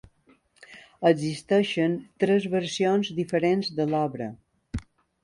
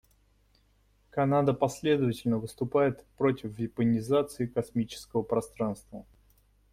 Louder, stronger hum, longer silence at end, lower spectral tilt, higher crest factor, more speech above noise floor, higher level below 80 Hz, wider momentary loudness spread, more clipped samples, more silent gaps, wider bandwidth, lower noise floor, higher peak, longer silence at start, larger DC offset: first, -25 LUFS vs -29 LUFS; second, none vs 50 Hz at -60 dBFS; second, 0.4 s vs 0.7 s; about the same, -6 dB/octave vs -7 dB/octave; about the same, 20 dB vs 18 dB; about the same, 38 dB vs 38 dB; first, -52 dBFS vs -60 dBFS; first, 14 LU vs 9 LU; neither; neither; second, 11.5 kHz vs 16 kHz; second, -62 dBFS vs -66 dBFS; first, -6 dBFS vs -12 dBFS; second, 0.7 s vs 1.15 s; neither